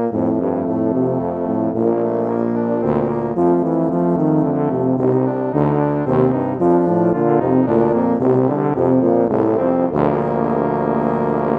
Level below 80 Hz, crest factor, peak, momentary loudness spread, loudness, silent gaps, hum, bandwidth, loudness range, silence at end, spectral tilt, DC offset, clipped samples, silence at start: -48 dBFS; 16 dB; -2 dBFS; 4 LU; -17 LUFS; none; none; 4.3 kHz; 2 LU; 0 s; -11 dB/octave; under 0.1%; under 0.1%; 0 s